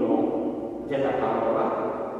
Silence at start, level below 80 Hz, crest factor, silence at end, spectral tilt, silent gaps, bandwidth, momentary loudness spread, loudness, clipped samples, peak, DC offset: 0 s; -58 dBFS; 16 dB; 0 s; -8 dB/octave; none; 7.8 kHz; 6 LU; -26 LUFS; under 0.1%; -10 dBFS; under 0.1%